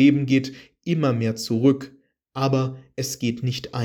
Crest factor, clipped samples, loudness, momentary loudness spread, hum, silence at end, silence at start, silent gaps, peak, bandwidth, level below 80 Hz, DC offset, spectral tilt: 18 dB; under 0.1%; -23 LUFS; 14 LU; none; 0 s; 0 s; none; -6 dBFS; 17.5 kHz; -62 dBFS; under 0.1%; -6 dB/octave